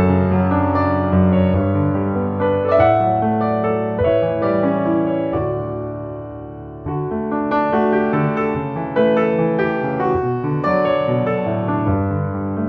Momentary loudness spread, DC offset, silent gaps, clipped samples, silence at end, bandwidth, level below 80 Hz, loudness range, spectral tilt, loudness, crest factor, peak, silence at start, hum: 8 LU; under 0.1%; none; under 0.1%; 0 s; 5.2 kHz; -42 dBFS; 4 LU; -10.5 dB/octave; -18 LUFS; 16 dB; -2 dBFS; 0 s; none